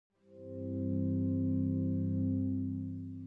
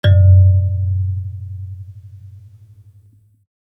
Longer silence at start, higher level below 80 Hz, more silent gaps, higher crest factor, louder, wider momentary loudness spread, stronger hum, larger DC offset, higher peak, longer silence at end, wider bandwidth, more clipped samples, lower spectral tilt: first, 0.3 s vs 0.05 s; second, -72 dBFS vs -48 dBFS; neither; about the same, 12 dB vs 14 dB; second, -35 LUFS vs -14 LUFS; second, 10 LU vs 23 LU; neither; neither; second, -24 dBFS vs -2 dBFS; second, 0 s vs 1.4 s; second, 1.6 kHz vs 3.7 kHz; neither; first, -13.5 dB/octave vs -9 dB/octave